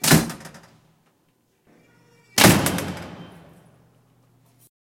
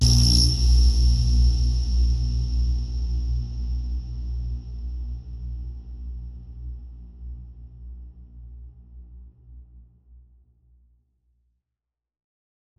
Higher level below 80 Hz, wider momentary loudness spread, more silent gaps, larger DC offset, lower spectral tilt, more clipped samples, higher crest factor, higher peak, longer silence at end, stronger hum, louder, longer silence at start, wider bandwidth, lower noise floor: second, -50 dBFS vs -26 dBFS; about the same, 26 LU vs 25 LU; neither; neither; about the same, -3.5 dB/octave vs -4.5 dB/octave; neither; first, 24 dB vs 18 dB; first, 0 dBFS vs -6 dBFS; second, 1.6 s vs 2.95 s; second, none vs 60 Hz at -40 dBFS; first, -18 LUFS vs -24 LUFS; about the same, 0 s vs 0 s; first, 16.5 kHz vs 12 kHz; second, -66 dBFS vs -86 dBFS